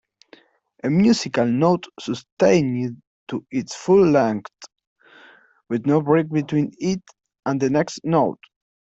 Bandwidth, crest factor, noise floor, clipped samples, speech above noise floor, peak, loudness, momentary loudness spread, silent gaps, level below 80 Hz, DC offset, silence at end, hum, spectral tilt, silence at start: 8.2 kHz; 18 dB; -53 dBFS; under 0.1%; 33 dB; -4 dBFS; -21 LUFS; 13 LU; 2.32-2.37 s, 3.07-3.27 s, 4.87-4.96 s; -60 dBFS; under 0.1%; 0.6 s; none; -6.5 dB/octave; 0.85 s